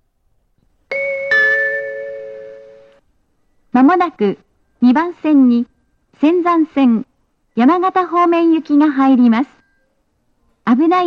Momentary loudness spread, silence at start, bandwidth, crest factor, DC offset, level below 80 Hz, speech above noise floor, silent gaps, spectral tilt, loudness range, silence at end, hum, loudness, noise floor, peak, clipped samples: 14 LU; 0.9 s; 6.4 kHz; 14 dB; under 0.1%; -62 dBFS; 50 dB; none; -7 dB/octave; 5 LU; 0 s; none; -14 LUFS; -63 dBFS; -2 dBFS; under 0.1%